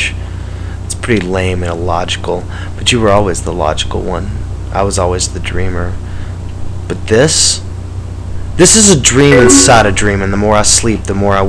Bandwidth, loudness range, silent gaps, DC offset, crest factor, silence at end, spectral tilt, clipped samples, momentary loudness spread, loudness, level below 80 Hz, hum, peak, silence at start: 11 kHz; 9 LU; none; under 0.1%; 12 dB; 0 s; -3.5 dB/octave; 0.9%; 19 LU; -10 LUFS; -24 dBFS; 60 Hz at -25 dBFS; 0 dBFS; 0 s